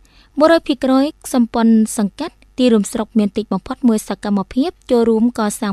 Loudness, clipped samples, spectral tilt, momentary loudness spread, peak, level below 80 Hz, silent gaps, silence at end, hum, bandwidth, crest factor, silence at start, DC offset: -16 LUFS; under 0.1%; -5.5 dB/octave; 8 LU; 0 dBFS; -46 dBFS; none; 0 s; none; 13.5 kHz; 16 dB; 0.35 s; under 0.1%